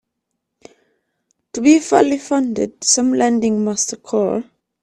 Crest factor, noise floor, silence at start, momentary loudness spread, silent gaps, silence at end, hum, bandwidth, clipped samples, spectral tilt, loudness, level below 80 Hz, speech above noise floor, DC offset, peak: 18 dB; -76 dBFS; 1.55 s; 8 LU; none; 0.4 s; none; 12 kHz; under 0.1%; -3.5 dB/octave; -16 LUFS; -58 dBFS; 60 dB; under 0.1%; 0 dBFS